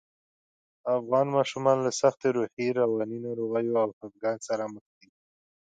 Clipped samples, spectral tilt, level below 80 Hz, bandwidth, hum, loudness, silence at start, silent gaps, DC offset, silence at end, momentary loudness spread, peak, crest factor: under 0.1%; -5.5 dB/octave; -76 dBFS; 9.4 kHz; none; -28 LUFS; 0.85 s; 2.53-2.57 s, 3.93-4.01 s; under 0.1%; 0.8 s; 8 LU; -10 dBFS; 20 dB